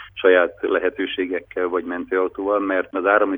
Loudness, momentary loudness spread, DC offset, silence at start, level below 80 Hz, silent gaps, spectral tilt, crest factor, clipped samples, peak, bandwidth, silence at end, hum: -21 LUFS; 8 LU; under 0.1%; 0 s; -56 dBFS; none; -7 dB/octave; 18 dB; under 0.1%; -2 dBFS; 3.8 kHz; 0 s; none